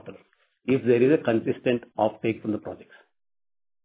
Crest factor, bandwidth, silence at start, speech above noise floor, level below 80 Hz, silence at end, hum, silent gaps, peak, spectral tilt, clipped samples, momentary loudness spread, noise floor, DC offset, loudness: 18 dB; 4 kHz; 0.05 s; 38 dB; -66 dBFS; 1.1 s; none; none; -8 dBFS; -11 dB/octave; under 0.1%; 15 LU; -62 dBFS; under 0.1%; -24 LUFS